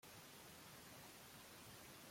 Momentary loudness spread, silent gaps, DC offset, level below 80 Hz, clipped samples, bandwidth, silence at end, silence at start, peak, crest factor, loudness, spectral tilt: 1 LU; none; under 0.1%; -80 dBFS; under 0.1%; 16.5 kHz; 0 s; 0 s; -48 dBFS; 12 dB; -59 LUFS; -2.5 dB/octave